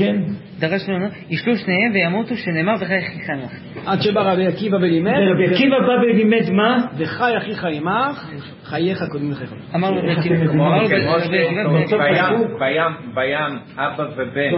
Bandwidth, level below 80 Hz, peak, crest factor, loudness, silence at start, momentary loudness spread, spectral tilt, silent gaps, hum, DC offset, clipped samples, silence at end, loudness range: 5.8 kHz; -56 dBFS; -2 dBFS; 16 dB; -18 LUFS; 0 s; 10 LU; -11.5 dB/octave; none; none; under 0.1%; under 0.1%; 0 s; 4 LU